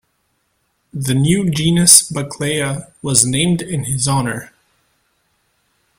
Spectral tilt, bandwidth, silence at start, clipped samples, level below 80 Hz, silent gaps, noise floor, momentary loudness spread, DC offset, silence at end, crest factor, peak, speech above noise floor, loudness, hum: -3.5 dB/octave; 16.5 kHz; 0.95 s; 0.1%; -46 dBFS; none; -66 dBFS; 16 LU; under 0.1%; 1.55 s; 18 dB; 0 dBFS; 50 dB; -14 LUFS; none